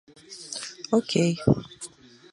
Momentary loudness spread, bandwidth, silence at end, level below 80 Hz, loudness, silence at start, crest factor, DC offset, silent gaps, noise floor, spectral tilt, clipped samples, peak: 19 LU; 11.5 kHz; 0.45 s; -52 dBFS; -26 LUFS; 0.3 s; 22 dB; under 0.1%; none; -45 dBFS; -5.5 dB/octave; under 0.1%; -4 dBFS